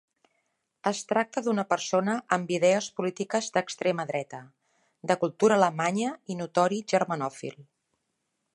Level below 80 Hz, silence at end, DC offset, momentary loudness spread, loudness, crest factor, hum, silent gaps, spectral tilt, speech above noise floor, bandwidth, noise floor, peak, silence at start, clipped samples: -78 dBFS; 0.9 s; under 0.1%; 11 LU; -27 LUFS; 22 dB; none; none; -4.5 dB/octave; 52 dB; 11.5 kHz; -79 dBFS; -6 dBFS; 0.85 s; under 0.1%